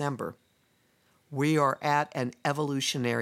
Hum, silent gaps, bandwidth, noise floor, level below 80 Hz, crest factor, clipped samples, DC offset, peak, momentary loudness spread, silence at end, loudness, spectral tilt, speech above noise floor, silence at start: none; none; 16 kHz; -68 dBFS; -78 dBFS; 20 dB; under 0.1%; under 0.1%; -10 dBFS; 12 LU; 0 s; -29 LUFS; -5 dB/octave; 40 dB; 0 s